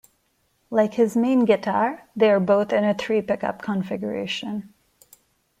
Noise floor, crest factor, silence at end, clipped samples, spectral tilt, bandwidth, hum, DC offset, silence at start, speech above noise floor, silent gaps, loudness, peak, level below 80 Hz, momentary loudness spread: -68 dBFS; 16 dB; 0.95 s; under 0.1%; -6.5 dB/octave; 15.5 kHz; none; under 0.1%; 0.7 s; 46 dB; none; -22 LUFS; -6 dBFS; -66 dBFS; 9 LU